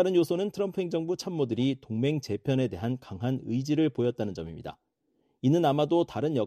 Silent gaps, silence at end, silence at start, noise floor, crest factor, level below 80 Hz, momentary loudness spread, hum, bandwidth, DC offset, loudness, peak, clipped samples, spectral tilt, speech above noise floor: none; 0 s; 0 s; -73 dBFS; 16 dB; -62 dBFS; 9 LU; none; 14 kHz; under 0.1%; -29 LUFS; -12 dBFS; under 0.1%; -7.5 dB/octave; 45 dB